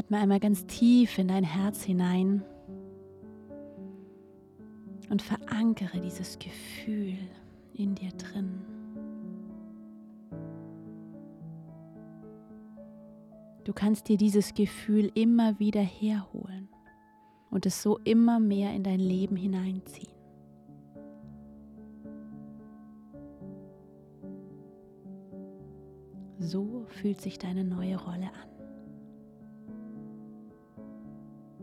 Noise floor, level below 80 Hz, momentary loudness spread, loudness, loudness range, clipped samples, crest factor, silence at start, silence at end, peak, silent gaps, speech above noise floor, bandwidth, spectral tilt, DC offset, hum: -60 dBFS; -64 dBFS; 25 LU; -29 LUFS; 20 LU; under 0.1%; 18 dB; 0 s; 0 s; -14 dBFS; none; 32 dB; 14.5 kHz; -6.5 dB/octave; under 0.1%; none